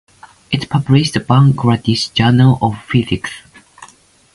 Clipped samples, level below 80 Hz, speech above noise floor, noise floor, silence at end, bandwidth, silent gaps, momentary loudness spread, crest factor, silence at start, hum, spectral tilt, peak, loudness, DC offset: under 0.1%; -42 dBFS; 33 dB; -46 dBFS; 0.5 s; 11.5 kHz; none; 11 LU; 14 dB; 0.5 s; none; -6.5 dB/octave; 0 dBFS; -14 LUFS; under 0.1%